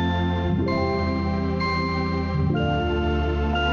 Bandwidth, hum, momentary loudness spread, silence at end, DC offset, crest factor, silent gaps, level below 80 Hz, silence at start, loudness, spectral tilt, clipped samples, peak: 7 kHz; none; 2 LU; 0 s; under 0.1%; 10 dB; none; -32 dBFS; 0 s; -24 LUFS; -8 dB/octave; under 0.1%; -12 dBFS